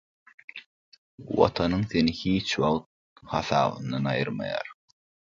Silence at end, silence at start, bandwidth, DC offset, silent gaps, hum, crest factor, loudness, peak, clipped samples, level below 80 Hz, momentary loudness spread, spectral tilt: 0.6 s; 0.55 s; 7.6 kHz; under 0.1%; 0.66-0.92 s, 0.98-1.18 s, 2.86-3.16 s; none; 22 dB; -27 LUFS; -6 dBFS; under 0.1%; -52 dBFS; 18 LU; -6 dB/octave